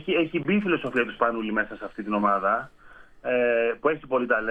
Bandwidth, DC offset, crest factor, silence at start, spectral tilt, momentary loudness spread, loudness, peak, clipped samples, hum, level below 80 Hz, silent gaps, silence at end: 8.2 kHz; under 0.1%; 18 dB; 0 s; -7.5 dB/octave; 7 LU; -25 LUFS; -8 dBFS; under 0.1%; none; -56 dBFS; none; 0 s